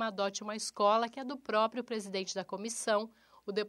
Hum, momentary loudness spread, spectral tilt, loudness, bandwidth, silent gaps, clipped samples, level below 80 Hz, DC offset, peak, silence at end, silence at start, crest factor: none; 10 LU; -3 dB/octave; -34 LUFS; 15 kHz; none; under 0.1%; -82 dBFS; under 0.1%; -16 dBFS; 0 s; 0 s; 18 dB